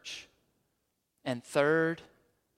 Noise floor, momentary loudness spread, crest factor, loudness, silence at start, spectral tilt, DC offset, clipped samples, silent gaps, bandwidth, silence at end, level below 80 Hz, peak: -80 dBFS; 16 LU; 24 dB; -31 LUFS; 0.05 s; -5 dB/octave; under 0.1%; under 0.1%; none; 15 kHz; 0.55 s; -76 dBFS; -12 dBFS